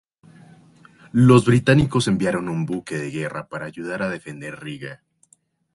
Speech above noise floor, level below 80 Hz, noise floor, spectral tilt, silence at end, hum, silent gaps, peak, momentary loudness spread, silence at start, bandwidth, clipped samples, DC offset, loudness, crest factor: 41 dB; -50 dBFS; -61 dBFS; -6.5 dB/octave; 0.8 s; none; none; 0 dBFS; 19 LU; 1.15 s; 11.5 kHz; under 0.1%; under 0.1%; -20 LUFS; 20 dB